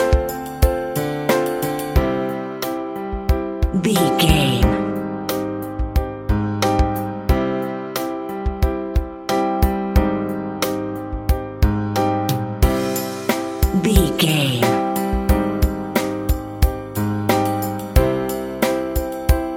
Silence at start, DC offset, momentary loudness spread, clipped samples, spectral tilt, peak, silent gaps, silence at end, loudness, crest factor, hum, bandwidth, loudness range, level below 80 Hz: 0 s; under 0.1%; 8 LU; under 0.1%; -5.5 dB/octave; 0 dBFS; none; 0 s; -20 LUFS; 18 dB; none; 17 kHz; 3 LU; -24 dBFS